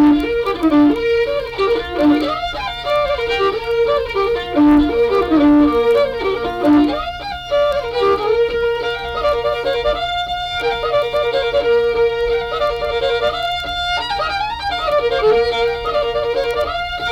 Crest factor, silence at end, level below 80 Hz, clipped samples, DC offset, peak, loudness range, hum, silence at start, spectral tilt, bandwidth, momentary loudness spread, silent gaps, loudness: 14 dB; 0 s; -36 dBFS; under 0.1%; under 0.1%; -2 dBFS; 3 LU; none; 0 s; -5.5 dB/octave; 13.5 kHz; 7 LU; none; -17 LUFS